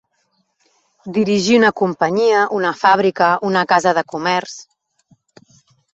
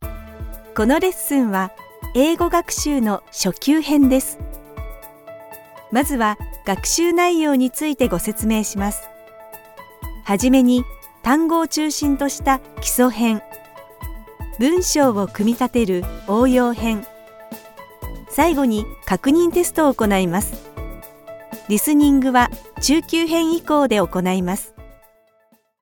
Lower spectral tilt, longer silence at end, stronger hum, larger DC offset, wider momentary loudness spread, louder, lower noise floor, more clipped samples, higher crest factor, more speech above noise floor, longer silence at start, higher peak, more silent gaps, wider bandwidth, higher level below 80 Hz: about the same, -4.5 dB/octave vs -4.5 dB/octave; first, 1.3 s vs 0.9 s; neither; neither; second, 9 LU vs 21 LU; about the same, -16 LUFS vs -18 LUFS; first, -66 dBFS vs -59 dBFS; neither; about the same, 16 dB vs 16 dB; first, 50 dB vs 42 dB; first, 1.05 s vs 0 s; about the same, -2 dBFS vs -2 dBFS; neither; second, 8.2 kHz vs 18 kHz; second, -60 dBFS vs -36 dBFS